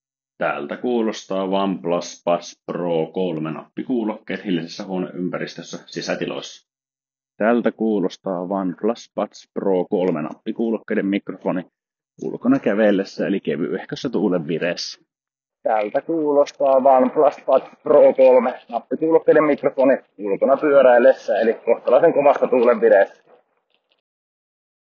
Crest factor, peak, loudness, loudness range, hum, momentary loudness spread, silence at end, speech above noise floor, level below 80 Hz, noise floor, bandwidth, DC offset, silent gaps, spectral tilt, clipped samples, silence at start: 18 dB; -2 dBFS; -19 LUFS; 9 LU; none; 14 LU; 1.9 s; over 71 dB; -72 dBFS; under -90 dBFS; 7.2 kHz; under 0.1%; none; -5 dB/octave; under 0.1%; 0.4 s